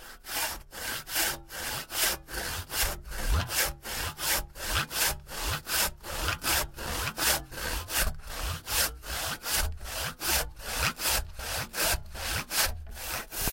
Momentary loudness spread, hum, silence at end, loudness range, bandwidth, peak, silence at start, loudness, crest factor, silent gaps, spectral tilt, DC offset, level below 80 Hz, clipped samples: 7 LU; none; 0 s; 1 LU; 16.5 kHz; -8 dBFS; 0 s; -30 LUFS; 22 dB; none; -1.5 dB/octave; under 0.1%; -40 dBFS; under 0.1%